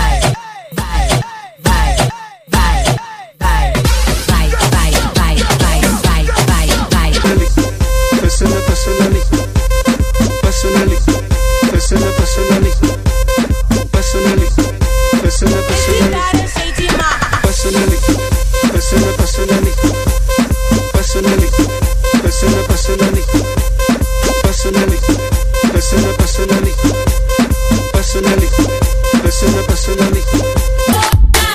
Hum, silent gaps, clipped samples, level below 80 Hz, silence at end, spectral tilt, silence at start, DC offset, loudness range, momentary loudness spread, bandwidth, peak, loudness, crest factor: none; none; under 0.1%; -14 dBFS; 0 s; -5 dB/octave; 0 s; under 0.1%; 1 LU; 3 LU; 15.5 kHz; 0 dBFS; -13 LUFS; 12 dB